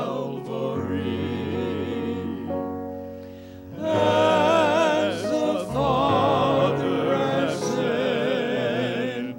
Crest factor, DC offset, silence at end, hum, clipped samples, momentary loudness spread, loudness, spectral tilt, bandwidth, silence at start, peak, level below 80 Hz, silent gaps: 16 dB; under 0.1%; 0 s; none; under 0.1%; 12 LU; -23 LUFS; -6 dB/octave; 16 kHz; 0 s; -6 dBFS; -54 dBFS; none